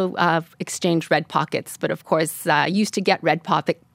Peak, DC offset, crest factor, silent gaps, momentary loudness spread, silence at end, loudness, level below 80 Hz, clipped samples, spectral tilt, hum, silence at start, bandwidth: -2 dBFS; under 0.1%; 20 dB; none; 7 LU; 0.2 s; -21 LUFS; -72 dBFS; under 0.1%; -4.5 dB/octave; none; 0 s; 16 kHz